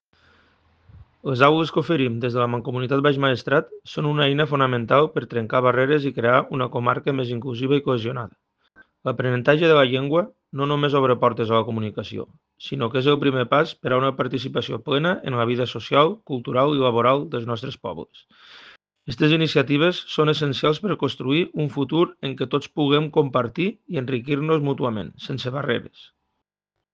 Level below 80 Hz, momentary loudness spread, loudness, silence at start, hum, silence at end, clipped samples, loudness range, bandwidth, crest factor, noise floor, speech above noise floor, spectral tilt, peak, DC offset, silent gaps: -62 dBFS; 11 LU; -21 LUFS; 0.95 s; none; 1.05 s; under 0.1%; 3 LU; 7.4 kHz; 22 dB; -82 dBFS; 61 dB; -7.5 dB/octave; 0 dBFS; under 0.1%; none